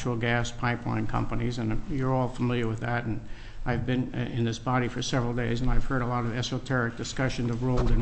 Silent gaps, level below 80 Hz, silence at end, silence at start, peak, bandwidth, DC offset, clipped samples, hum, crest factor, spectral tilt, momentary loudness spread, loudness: none; -34 dBFS; 0 s; 0 s; -10 dBFS; 8.6 kHz; under 0.1%; under 0.1%; none; 16 dB; -6 dB/octave; 4 LU; -29 LUFS